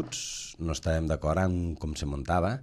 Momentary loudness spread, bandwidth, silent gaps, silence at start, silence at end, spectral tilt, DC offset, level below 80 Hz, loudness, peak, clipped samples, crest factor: 7 LU; 13 kHz; none; 0 s; 0 s; -5.5 dB/octave; under 0.1%; -42 dBFS; -30 LUFS; -14 dBFS; under 0.1%; 16 dB